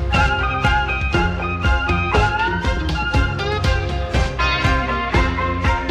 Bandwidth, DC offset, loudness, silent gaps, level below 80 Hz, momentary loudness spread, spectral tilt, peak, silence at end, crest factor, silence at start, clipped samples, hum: 9.8 kHz; under 0.1%; -19 LUFS; none; -24 dBFS; 4 LU; -5.5 dB/octave; -4 dBFS; 0 s; 16 dB; 0 s; under 0.1%; none